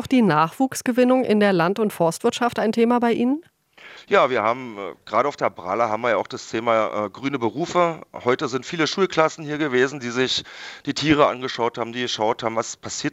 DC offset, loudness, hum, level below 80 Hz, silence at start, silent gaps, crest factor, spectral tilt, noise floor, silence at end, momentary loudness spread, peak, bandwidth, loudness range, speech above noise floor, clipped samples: under 0.1%; -21 LUFS; none; -60 dBFS; 0 s; none; 20 dB; -4.5 dB/octave; -45 dBFS; 0.05 s; 9 LU; -2 dBFS; 15.5 kHz; 3 LU; 24 dB; under 0.1%